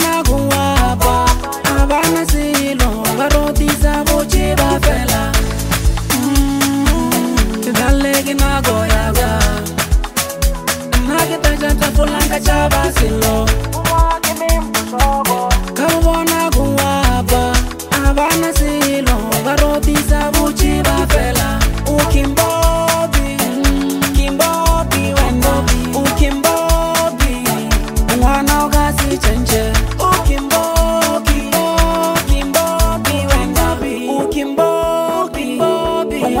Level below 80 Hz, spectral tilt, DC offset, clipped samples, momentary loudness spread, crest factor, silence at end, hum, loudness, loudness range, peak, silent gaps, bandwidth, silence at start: -18 dBFS; -4.5 dB/octave; under 0.1%; under 0.1%; 3 LU; 14 dB; 0 s; none; -14 LUFS; 1 LU; 0 dBFS; none; 16.5 kHz; 0 s